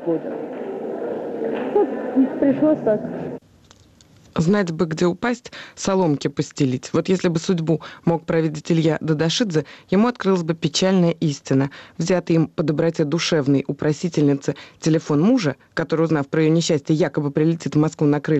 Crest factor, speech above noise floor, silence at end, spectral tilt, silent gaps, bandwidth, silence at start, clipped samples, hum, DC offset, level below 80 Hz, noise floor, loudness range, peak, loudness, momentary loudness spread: 12 dB; 31 dB; 0 s; -6 dB/octave; none; 8.4 kHz; 0 s; under 0.1%; none; under 0.1%; -58 dBFS; -51 dBFS; 2 LU; -8 dBFS; -21 LUFS; 9 LU